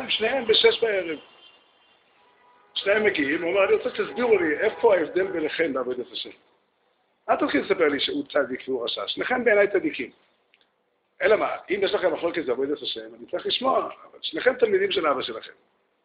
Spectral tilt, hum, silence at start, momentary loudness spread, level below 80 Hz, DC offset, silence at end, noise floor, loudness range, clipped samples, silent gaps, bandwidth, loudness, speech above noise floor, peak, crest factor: -8 dB/octave; none; 0 s; 13 LU; -64 dBFS; under 0.1%; 0.55 s; -71 dBFS; 4 LU; under 0.1%; none; 5.2 kHz; -24 LUFS; 47 dB; -4 dBFS; 20 dB